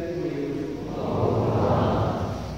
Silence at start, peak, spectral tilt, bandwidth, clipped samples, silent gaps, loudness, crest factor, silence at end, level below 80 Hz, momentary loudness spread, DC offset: 0 s; -10 dBFS; -8 dB/octave; 15.5 kHz; under 0.1%; none; -25 LUFS; 14 dB; 0 s; -42 dBFS; 8 LU; 0.2%